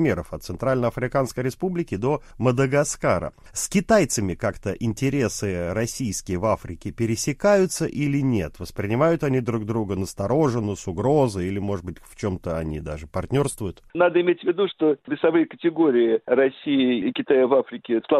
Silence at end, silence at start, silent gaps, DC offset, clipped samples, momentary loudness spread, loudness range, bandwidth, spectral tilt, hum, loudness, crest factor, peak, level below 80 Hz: 0 s; 0 s; none; under 0.1%; under 0.1%; 9 LU; 4 LU; 15 kHz; -6 dB/octave; none; -23 LUFS; 18 dB; -4 dBFS; -46 dBFS